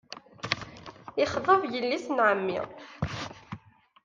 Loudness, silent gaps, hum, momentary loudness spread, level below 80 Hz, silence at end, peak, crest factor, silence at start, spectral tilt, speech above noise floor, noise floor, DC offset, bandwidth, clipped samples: -28 LUFS; none; none; 21 LU; -58 dBFS; 0.45 s; -8 dBFS; 22 dB; 0.1 s; -5 dB/octave; 26 dB; -53 dBFS; under 0.1%; 7.6 kHz; under 0.1%